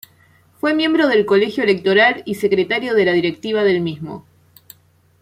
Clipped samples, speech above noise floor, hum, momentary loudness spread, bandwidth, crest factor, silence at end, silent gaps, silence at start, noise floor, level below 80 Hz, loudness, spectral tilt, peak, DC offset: under 0.1%; 38 dB; none; 10 LU; 16 kHz; 16 dB; 1 s; none; 0.65 s; -54 dBFS; -62 dBFS; -16 LUFS; -6 dB/octave; -2 dBFS; under 0.1%